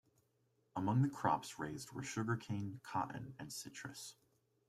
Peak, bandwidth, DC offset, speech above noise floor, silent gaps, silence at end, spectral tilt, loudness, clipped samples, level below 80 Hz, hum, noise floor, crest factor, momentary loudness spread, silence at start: -20 dBFS; 15 kHz; under 0.1%; 38 dB; none; 0.55 s; -5.5 dB/octave; -41 LUFS; under 0.1%; -74 dBFS; none; -79 dBFS; 22 dB; 13 LU; 0.75 s